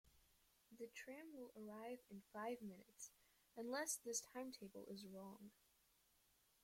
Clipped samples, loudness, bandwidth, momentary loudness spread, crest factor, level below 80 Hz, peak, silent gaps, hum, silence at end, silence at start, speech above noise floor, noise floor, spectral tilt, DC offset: under 0.1%; -53 LUFS; 16.5 kHz; 14 LU; 22 dB; -88 dBFS; -32 dBFS; none; none; 1.15 s; 0.05 s; 26 dB; -80 dBFS; -2.5 dB/octave; under 0.1%